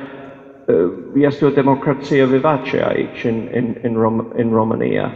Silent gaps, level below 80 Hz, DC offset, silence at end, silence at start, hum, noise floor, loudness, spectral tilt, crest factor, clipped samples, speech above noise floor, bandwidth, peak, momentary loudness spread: none; -52 dBFS; under 0.1%; 0 s; 0 s; none; -37 dBFS; -17 LUFS; -8.5 dB/octave; 16 dB; under 0.1%; 21 dB; 7.2 kHz; 0 dBFS; 7 LU